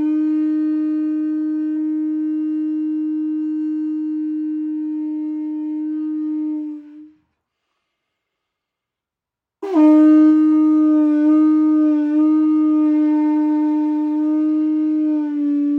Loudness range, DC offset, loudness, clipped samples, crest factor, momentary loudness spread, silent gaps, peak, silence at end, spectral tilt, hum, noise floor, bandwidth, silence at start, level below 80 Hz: 13 LU; under 0.1%; -17 LUFS; under 0.1%; 12 dB; 11 LU; none; -4 dBFS; 0 s; -7.5 dB/octave; none; -86 dBFS; 3.2 kHz; 0 s; -82 dBFS